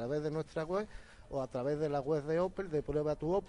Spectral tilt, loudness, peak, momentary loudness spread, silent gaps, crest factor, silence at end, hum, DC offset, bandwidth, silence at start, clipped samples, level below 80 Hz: -7.5 dB/octave; -36 LUFS; -22 dBFS; 7 LU; none; 14 dB; 0 s; none; under 0.1%; 10.5 kHz; 0 s; under 0.1%; -56 dBFS